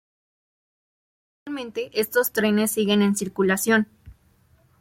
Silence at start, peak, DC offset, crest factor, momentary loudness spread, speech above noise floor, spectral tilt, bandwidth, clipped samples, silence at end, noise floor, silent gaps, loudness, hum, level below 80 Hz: 1.45 s; -6 dBFS; under 0.1%; 18 dB; 12 LU; 38 dB; -4 dB/octave; 16.5 kHz; under 0.1%; 0.7 s; -60 dBFS; none; -22 LUFS; none; -60 dBFS